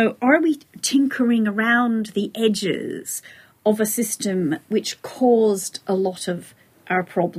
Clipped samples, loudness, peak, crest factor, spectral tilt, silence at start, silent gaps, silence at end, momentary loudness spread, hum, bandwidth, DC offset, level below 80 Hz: under 0.1%; -21 LUFS; -2 dBFS; 18 dB; -4 dB/octave; 0 s; none; 0 s; 11 LU; none; 15.5 kHz; under 0.1%; -68 dBFS